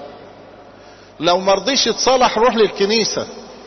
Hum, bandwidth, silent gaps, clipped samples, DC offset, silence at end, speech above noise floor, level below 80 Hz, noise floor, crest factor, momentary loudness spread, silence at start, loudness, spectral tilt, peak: none; 6.4 kHz; none; under 0.1%; under 0.1%; 0 s; 26 dB; -48 dBFS; -42 dBFS; 14 dB; 9 LU; 0 s; -15 LUFS; -2.5 dB/octave; -4 dBFS